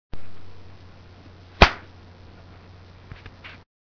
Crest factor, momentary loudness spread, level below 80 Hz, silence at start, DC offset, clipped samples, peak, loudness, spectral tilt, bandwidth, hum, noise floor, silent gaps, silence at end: 28 dB; 29 LU; -32 dBFS; 0.15 s; under 0.1%; under 0.1%; 0 dBFS; -18 LUFS; -5 dB/octave; 5.4 kHz; none; -46 dBFS; none; 0.4 s